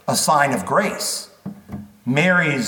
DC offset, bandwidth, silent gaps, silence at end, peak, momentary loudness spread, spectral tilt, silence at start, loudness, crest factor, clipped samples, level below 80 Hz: under 0.1%; 19 kHz; none; 0 s; -2 dBFS; 20 LU; -3.5 dB/octave; 0.05 s; -18 LUFS; 18 dB; under 0.1%; -60 dBFS